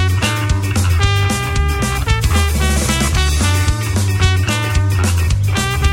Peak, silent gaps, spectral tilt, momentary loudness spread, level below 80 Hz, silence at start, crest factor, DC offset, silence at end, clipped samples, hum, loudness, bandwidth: 0 dBFS; none; -4.5 dB/octave; 2 LU; -20 dBFS; 0 s; 14 dB; under 0.1%; 0 s; under 0.1%; none; -15 LUFS; 16.5 kHz